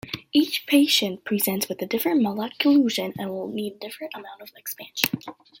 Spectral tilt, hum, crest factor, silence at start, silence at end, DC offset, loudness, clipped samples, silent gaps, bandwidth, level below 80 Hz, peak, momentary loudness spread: -3.5 dB/octave; none; 24 dB; 0.05 s; 0.3 s; under 0.1%; -23 LUFS; under 0.1%; none; 17 kHz; -68 dBFS; 0 dBFS; 16 LU